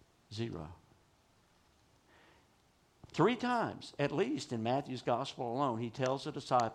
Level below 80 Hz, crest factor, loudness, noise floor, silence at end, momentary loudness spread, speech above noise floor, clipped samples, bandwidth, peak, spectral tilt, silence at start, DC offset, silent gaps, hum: -70 dBFS; 20 dB; -36 LUFS; -70 dBFS; 0 s; 11 LU; 35 dB; under 0.1%; 12 kHz; -16 dBFS; -6 dB/octave; 0.3 s; under 0.1%; none; none